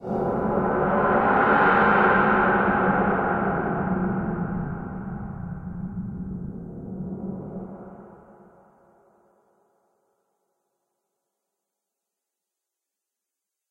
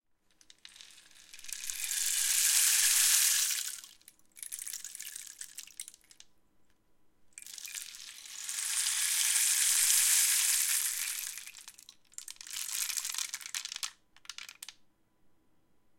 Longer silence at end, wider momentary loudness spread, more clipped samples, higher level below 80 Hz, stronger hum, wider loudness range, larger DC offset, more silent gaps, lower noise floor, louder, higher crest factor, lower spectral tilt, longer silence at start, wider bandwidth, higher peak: first, 5.55 s vs 1.3 s; second, 18 LU vs 23 LU; neither; first, -46 dBFS vs -78 dBFS; neither; about the same, 19 LU vs 18 LU; neither; neither; first, -86 dBFS vs -68 dBFS; first, -23 LUFS vs -28 LUFS; second, 20 dB vs 28 dB; first, -9.5 dB/octave vs 5.5 dB/octave; second, 0 s vs 0.8 s; second, 4.8 kHz vs 17 kHz; about the same, -6 dBFS vs -6 dBFS